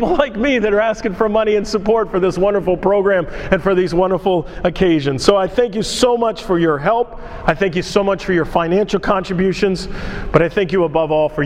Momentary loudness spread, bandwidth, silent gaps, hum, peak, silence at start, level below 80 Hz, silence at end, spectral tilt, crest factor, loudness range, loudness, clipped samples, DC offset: 4 LU; 14.5 kHz; none; none; 0 dBFS; 0 s; -34 dBFS; 0 s; -5.5 dB/octave; 16 dB; 1 LU; -16 LUFS; under 0.1%; under 0.1%